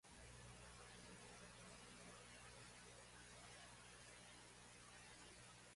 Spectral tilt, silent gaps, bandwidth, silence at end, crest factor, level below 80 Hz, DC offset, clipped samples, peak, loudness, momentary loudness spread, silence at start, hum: -2.5 dB/octave; none; 11.5 kHz; 0 s; 14 dB; -74 dBFS; under 0.1%; under 0.1%; -48 dBFS; -61 LUFS; 2 LU; 0.05 s; 60 Hz at -70 dBFS